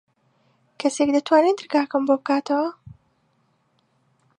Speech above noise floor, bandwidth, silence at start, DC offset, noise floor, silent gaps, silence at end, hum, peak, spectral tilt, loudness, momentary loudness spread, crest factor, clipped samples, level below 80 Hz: 46 dB; 10.5 kHz; 0.8 s; under 0.1%; -66 dBFS; none; 1.65 s; none; -4 dBFS; -4 dB/octave; -21 LUFS; 8 LU; 20 dB; under 0.1%; -66 dBFS